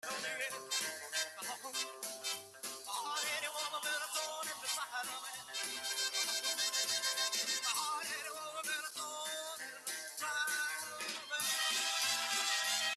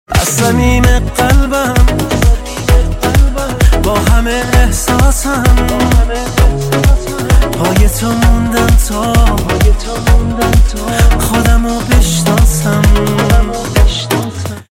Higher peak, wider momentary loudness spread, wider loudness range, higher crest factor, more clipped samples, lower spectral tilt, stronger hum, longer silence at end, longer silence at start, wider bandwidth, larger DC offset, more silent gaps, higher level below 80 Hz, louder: second, -20 dBFS vs 0 dBFS; first, 9 LU vs 2 LU; first, 4 LU vs 1 LU; first, 18 dB vs 10 dB; second, under 0.1% vs 0.2%; second, 2 dB/octave vs -5 dB/octave; neither; about the same, 0 s vs 0.1 s; about the same, 0.05 s vs 0.1 s; about the same, 15.5 kHz vs 16.5 kHz; neither; neither; second, -88 dBFS vs -12 dBFS; second, -37 LUFS vs -11 LUFS